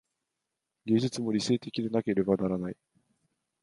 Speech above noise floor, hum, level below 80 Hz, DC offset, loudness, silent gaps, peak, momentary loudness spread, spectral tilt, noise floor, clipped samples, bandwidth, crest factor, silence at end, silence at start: 57 dB; none; -64 dBFS; under 0.1%; -30 LUFS; none; -10 dBFS; 11 LU; -6 dB/octave; -86 dBFS; under 0.1%; 11.5 kHz; 20 dB; 0.9 s; 0.85 s